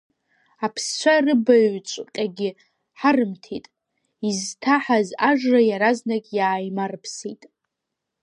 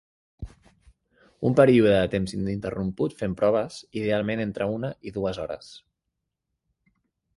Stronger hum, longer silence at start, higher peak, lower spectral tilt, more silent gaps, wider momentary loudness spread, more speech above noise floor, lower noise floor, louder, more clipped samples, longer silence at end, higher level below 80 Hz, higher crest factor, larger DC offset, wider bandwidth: neither; first, 0.6 s vs 0.4 s; about the same, -4 dBFS vs -6 dBFS; second, -4 dB/octave vs -7 dB/octave; neither; second, 14 LU vs 18 LU; about the same, 61 dB vs 58 dB; about the same, -82 dBFS vs -82 dBFS; first, -21 LUFS vs -25 LUFS; neither; second, 0.9 s vs 1.6 s; second, -74 dBFS vs -50 dBFS; about the same, 18 dB vs 20 dB; neither; about the same, 11.5 kHz vs 11.5 kHz